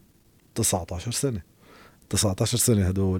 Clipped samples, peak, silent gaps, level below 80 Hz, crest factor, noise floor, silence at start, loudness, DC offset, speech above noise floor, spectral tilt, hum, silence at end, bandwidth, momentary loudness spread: under 0.1%; -10 dBFS; none; -50 dBFS; 16 dB; -59 dBFS; 0.55 s; -24 LUFS; under 0.1%; 35 dB; -4.5 dB/octave; none; 0 s; 17 kHz; 9 LU